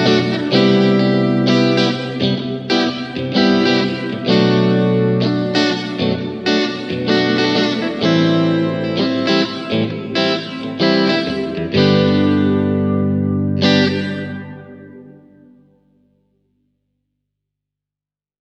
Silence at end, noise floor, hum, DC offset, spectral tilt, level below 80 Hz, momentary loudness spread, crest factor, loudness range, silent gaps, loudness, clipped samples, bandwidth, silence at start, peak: 3.3 s; -89 dBFS; 50 Hz at -45 dBFS; under 0.1%; -6.5 dB/octave; -54 dBFS; 7 LU; 16 dB; 4 LU; none; -16 LUFS; under 0.1%; 8.2 kHz; 0 s; 0 dBFS